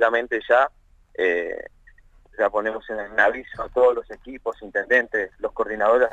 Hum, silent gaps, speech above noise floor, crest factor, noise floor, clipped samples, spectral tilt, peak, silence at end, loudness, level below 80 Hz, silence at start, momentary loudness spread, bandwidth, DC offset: none; none; 30 dB; 18 dB; -52 dBFS; under 0.1%; -4.5 dB/octave; -4 dBFS; 0 s; -22 LUFS; -52 dBFS; 0 s; 12 LU; 7.8 kHz; under 0.1%